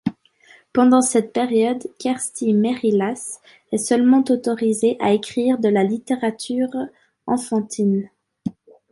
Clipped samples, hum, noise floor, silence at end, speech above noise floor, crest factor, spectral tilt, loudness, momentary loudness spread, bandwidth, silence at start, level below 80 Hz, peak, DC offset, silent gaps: under 0.1%; none; -52 dBFS; 0.4 s; 33 dB; 16 dB; -5 dB/octave; -20 LUFS; 16 LU; 11.5 kHz; 0.05 s; -64 dBFS; -4 dBFS; under 0.1%; none